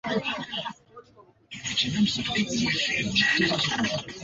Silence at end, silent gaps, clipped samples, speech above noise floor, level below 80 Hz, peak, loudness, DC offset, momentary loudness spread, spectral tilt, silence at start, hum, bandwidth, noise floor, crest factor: 0 s; none; under 0.1%; 30 dB; -56 dBFS; -10 dBFS; -25 LUFS; under 0.1%; 12 LU; -3.5 dB/octave; 0.05 s; none; 7.8 kHz; -56 dBFS; 18 dB